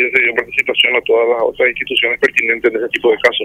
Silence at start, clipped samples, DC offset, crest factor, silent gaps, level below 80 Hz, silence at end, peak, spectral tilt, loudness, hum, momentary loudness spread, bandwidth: 0 s; under 0.1%; under 0.1%; 14 dB; none; -52 dBFS; 0 s; 0 dBFS; -3 dB/octave; -13 LUFS; none; 4 LU; 15 kHz